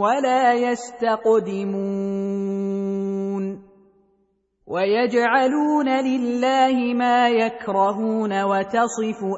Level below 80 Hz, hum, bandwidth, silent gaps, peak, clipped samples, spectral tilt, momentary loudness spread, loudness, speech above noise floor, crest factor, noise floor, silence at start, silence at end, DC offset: -66 dBFS; none; 8 kHz; none; -4 dBFS; under 0.1%; -5.5 dB/octave; 7 LU; -21 LUFS; 46 dB; 16 dB; -66 dBFS; 0 s; 0 s; under 0.1%